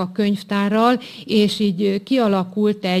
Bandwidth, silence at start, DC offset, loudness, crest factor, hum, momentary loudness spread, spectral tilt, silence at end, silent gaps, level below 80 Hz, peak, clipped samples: 14 kHz; 0 s; under 0.1%; -19 LUFS; 14 dB; none; 4 LU; -6.5 dB/octave; 0 s; none; -60 dBFS; -4 dBFS; under 0.1%